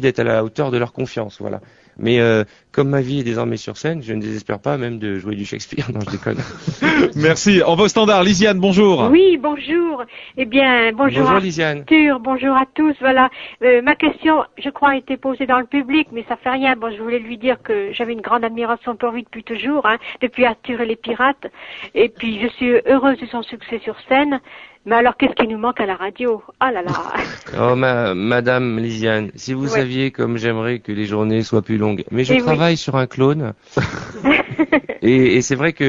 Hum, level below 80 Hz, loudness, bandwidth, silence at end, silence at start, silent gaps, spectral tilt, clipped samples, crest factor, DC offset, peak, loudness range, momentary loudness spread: none; -50 dBFS; -17 LUFS; 7.8 kHz; 0 s; 0 s; none; -5.5 dB/octave; under 0.1%; 16 dB; under 0.1%; 0 dBFS; 6 LU; 12 LU